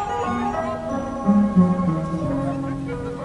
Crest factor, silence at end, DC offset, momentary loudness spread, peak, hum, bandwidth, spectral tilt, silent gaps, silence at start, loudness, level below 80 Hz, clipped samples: 16 dB; 0 s; under 0.1%; 10 LU; -6 dBFS; none; 10.5 kHz; -8.5 dB/octave; none; 0 s; -22 LUFS; -42 dBFS; under 0.1%